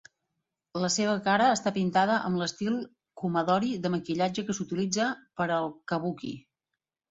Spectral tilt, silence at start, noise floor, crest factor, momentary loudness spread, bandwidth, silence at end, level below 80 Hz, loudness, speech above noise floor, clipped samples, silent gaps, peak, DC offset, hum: -4.5 dB/octave; 0.75 s; -87 dBFS; 18 dB; 10 LU; 8 kHz; 0.7 s; -68 dBFS; -28 LUFS; 59 dB; under 0.1%; none; -10 dBFS; under 0.1%; none